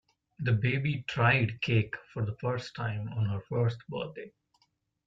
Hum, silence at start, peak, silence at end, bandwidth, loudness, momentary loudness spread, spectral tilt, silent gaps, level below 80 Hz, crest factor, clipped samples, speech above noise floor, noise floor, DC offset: none; 0.4 s; -12 dBFS; 0.75 s; 7.2 kHz; -31 LUFS; 12 LU; -7.5 dB/octave; none; -62 dBFS; 20 dB; under 0.1%; 44 dB; -74 dBFS; under 0.1%